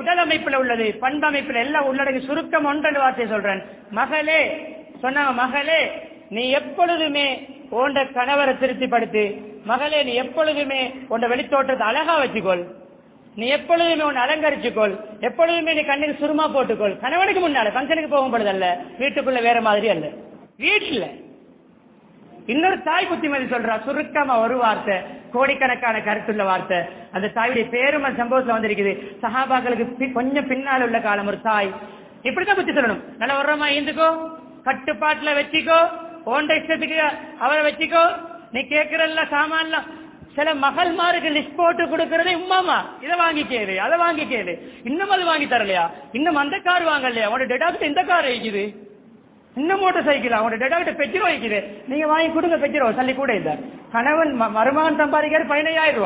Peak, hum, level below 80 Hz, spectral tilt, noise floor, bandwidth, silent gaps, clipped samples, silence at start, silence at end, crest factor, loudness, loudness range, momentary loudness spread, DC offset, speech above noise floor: -4 dBFS; none; -60 dBFS; -7.5 dB/octave; -51 dBFS; 4 kHz; none; under 0.1%; 0 s; 0 s; 16 dB; -20 LUFS; 2 LU; 7 LU; under 0.1%; 31 dB